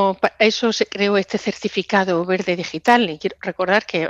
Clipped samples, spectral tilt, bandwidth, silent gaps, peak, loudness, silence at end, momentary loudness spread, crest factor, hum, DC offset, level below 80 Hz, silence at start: under 0.1%; -4.5 dB/octave; 11.5 kHz; none; 0 dBFS; -19 LUFS; 0 s; 8 LU; 18 dB; none; under 0.1%; -60 dBFS; 0 s